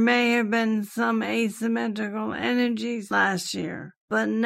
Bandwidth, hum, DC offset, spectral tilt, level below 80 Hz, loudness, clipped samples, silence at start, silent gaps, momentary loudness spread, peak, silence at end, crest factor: 15 kHz; none; under 0.1%; -4.5 dB/octave; -72 dBFS; -25 LUFS; under 0.1%; 0 s; 3.97-4.08 s; 8 LU; -10 dBFS; 0 s; 16 dB